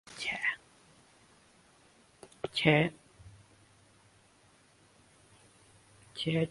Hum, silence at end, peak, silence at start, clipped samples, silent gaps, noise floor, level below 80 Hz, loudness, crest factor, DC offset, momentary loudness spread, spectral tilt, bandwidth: none; 0 s; -10 dBFS; 0.1 s; under 0.1%; none; -64 dBFS; -66 dBFS; -31 LUFS; 28 dB; under 0.1%; 23 LU; -5.5 dB/octave; 11.5 kHz